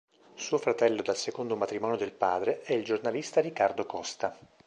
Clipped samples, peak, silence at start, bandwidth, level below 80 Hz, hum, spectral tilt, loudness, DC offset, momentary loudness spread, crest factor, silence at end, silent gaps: under 0.1%; -10 dBFS; 0.35 s; 9.8 kHz; -72 dBFS; none; -4 dB/octave; -30 LUFS; under 0.1%; 8 LU; 20 dB; 0.3 s; none